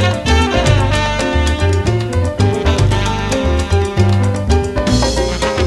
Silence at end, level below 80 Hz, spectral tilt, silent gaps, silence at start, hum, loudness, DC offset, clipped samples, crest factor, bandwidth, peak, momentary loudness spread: 0 s; -20 dBFS; -5.5 dB/octave; none; 0 s; none; -15 LUFS; under 0.1%; under 0.1%; 12 dB; 12 kHz; 0 dBFS; 4 LU